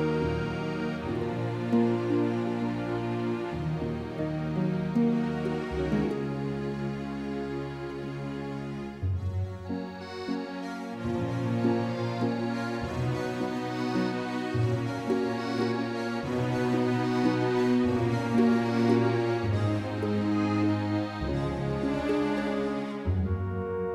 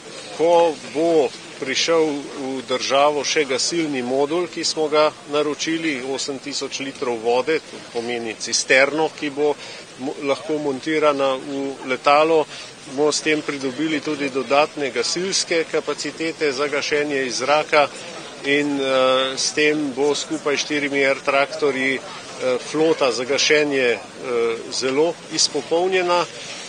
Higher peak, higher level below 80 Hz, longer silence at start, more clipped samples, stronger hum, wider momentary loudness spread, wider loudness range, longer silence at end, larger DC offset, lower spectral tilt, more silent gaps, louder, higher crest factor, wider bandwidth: second, -12 dBFS vs 0 dBFS; first, -48 dBFS vs -68 dBFS; about the same, 0 s vs 0 s; neither; neither; about the same, 9 LU vs 10 LU; first, 8 LU vs 2 LU; about the same, 0 s vs 0 s; neither; first, -7.5 dB/octave vs -2.5 dB/octave; neither; second, -29 LUFS vs -20 LUFS; about the same, 18 dB vs 20 dB; first, 12 kHz vs 10 kHz